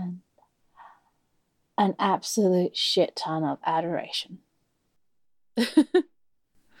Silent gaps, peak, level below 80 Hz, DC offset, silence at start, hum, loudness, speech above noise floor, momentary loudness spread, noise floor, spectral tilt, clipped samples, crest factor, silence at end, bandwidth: none; -8 dBFS; -78 dBFS; under 0.1%; 0 s; none; -25 LUFS; 55 dB; 13 LU; -80 dBFS; -4.5 dB/octave; under 0.1%; 20 dB; 0.8 s; 16.5 kHz